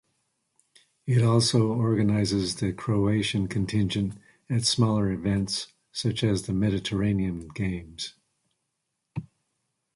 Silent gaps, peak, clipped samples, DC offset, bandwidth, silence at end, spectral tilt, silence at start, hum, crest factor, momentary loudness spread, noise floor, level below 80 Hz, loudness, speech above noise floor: none; -8 dBFS; under 0.1%; under 0.1%; 11.5 kHz; 0.7 s; -5.5 dB/octave; 1.05 s; none; 18 dB; 14 LU; -80 dBFS; -48 dBFS; -26 LUFS; 55 dB